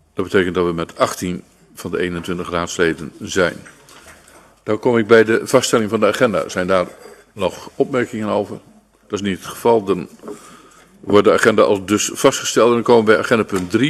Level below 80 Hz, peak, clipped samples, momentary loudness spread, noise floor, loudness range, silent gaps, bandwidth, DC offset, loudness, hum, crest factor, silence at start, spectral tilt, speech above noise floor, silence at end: -52 dBFS; 0 dBFS; under 0.1%; 15 LU; -47 dBFS; 7 LU; none; 13.5 kHz; under 0.1%; -17 LUFS; none; 18 dB; 0.15 s; -4.5 dB/octave; 30 dB; 0 s